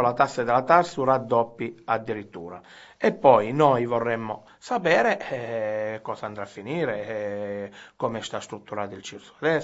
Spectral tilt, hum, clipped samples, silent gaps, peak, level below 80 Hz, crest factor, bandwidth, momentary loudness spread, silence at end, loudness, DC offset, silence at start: -6 dB/octave; none; under 0.1%; none; -2 dBFS; -66 dBFS; 22 dB; 8 kHz; 16 LU; 0 s; -25 LUFS; under 0.1%; 0 s